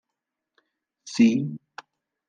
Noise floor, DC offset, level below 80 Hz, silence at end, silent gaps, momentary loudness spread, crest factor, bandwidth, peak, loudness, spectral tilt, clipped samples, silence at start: -85 dBFS; under 0.1%; -78 dBFS; 0.7 s; none; 26 LU; 20 dB; 9.2 kHz; -8 dBFS; -23 LUFS; -5.5 dB/octave; under 0.1%; 1.05 s